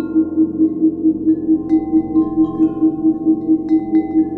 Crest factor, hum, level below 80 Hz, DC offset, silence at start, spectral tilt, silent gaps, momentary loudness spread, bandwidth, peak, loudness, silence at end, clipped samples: 10 dB; none; -48 dBFS; under 0.1%; 0 s; -11.5 dB/octave; none; 2 LU; 2.2 kHz; -4 dBFS; -16 LUFS; 0 s; under 0.1%